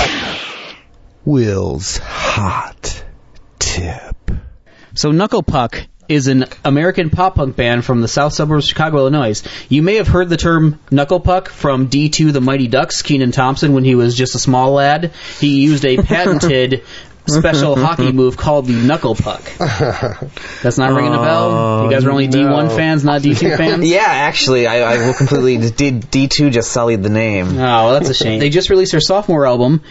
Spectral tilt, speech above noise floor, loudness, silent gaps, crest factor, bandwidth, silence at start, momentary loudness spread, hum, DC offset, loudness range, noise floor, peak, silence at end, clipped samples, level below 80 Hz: -5.5 dB/octave; 30 dB; -13 LUFS; none; 12 dB; 8 kHz; 0 s; 9 LU; none; under 0.1%; 6 LU; -42 dBFS; 0 dBFS; 0 s; under 0.1%; -32 dBFS